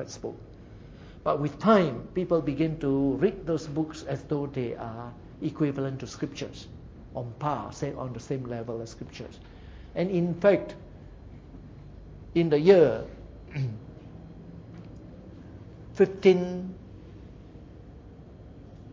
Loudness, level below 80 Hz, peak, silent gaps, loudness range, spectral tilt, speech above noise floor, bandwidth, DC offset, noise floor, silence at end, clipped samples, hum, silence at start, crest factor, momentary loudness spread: -27 LUFS; -52 dBFS; -6 dBFS; none; 8 LU; -7.5 dB/octave; 20 dB; 7.6 kHz; under 0.1%; -47 dBFS; 0 s; under 0.1%; none; 0 s; 24 dB; 26 LU